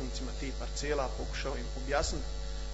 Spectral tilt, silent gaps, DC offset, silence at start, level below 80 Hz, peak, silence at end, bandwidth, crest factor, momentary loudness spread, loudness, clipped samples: -4 dB/octave; none; under 0.1%; 0 s; -38 dBFS; -16 dBFS; 0 s; 8 kHz; 18 dB; 7 LU; -36 LUFS; under 0.1%